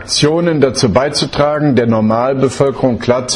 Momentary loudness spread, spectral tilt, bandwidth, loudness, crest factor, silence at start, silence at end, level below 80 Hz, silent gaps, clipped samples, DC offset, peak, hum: 3 LU; -5 dB/octave; 11.5 kHz; -13 LUFS; 12 dB; 0 s; 0 s; -42 dBFS; none; under 0.1%; under 0.1%; 0 dBFS; none